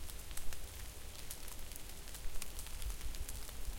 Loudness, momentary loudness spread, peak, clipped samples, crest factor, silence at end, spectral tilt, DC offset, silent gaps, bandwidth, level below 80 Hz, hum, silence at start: -48 LUFS; 3 LU; -22 dBFS; under 0.1%; 18 dB; 0 s; -2.5 dB/octave; under 0.1%; none; 17 kHz; -46 dBFS; none; 0 s